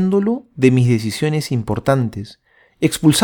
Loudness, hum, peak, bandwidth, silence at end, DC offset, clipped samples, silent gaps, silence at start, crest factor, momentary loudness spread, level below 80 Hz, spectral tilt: -17 LUFS; none; 0 dBFS; 19 kHz; 0 s; under 0.1%; under 0.1%; none; 0 s; 16 dB; 9 LU; -48 dBFS; -6 dB/octave